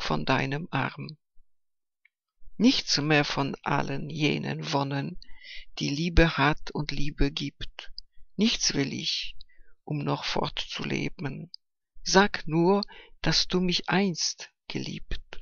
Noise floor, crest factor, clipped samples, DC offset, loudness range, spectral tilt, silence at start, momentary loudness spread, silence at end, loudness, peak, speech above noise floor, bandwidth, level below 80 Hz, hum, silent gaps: -77 dBFS; 24 dB; under 0.1%; under 0.1%; 4 LU; -4 dB/octave; 0 s; 17 LU; 0 s; -27 LUFS; -4 dBFS; 50 dB; 7.4 kHz; -40 dBFS; none; none